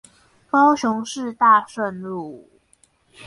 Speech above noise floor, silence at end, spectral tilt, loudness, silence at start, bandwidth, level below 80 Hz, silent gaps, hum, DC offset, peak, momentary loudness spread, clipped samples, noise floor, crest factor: 40 dB; 0 s; -4.5 dB/octave; -19 LUFS; 0.55 s; 11.5 kHz; -66 dBFS; none; none; under 0.1%; -4 dBFS; 15 LU; under 0.1%; -60 dBFS; 18 dB